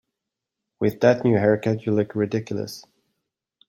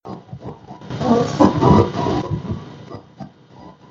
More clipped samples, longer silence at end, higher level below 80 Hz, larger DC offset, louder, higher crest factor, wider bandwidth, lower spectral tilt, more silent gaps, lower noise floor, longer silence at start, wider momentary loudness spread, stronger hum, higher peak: neither; first, 0.9 s vs 0.2 s; second, -62 dBFS vs -40 dBFS; neither; second, -22 LUFS vs -17 LUFS; about the same, 20 dB vs 20 dB; first, 16 kHz vs 7.6 kHz; about the same, -7.5 dB/octave vs -7.5 dB/octave; neither; first, -84 dBFS vs -43 dBFS; first, 0.8 s vs 0.05 s; second, 12 LU vs 24 LU; neither; second, -4 dBFS vs 0 dBFS